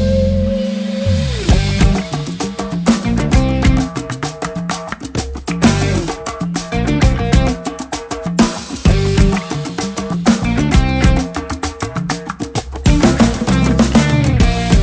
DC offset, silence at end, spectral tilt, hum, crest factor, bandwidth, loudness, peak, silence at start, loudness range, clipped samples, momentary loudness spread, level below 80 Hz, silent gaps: under 0.1%; 0 s; -6 dB/octave; none; 14 dB; 8 kHz; -16 LUFS; 0 dBFS; 0 s; 2 LU; under 0.1%; 10 LU; -20 dBFS; none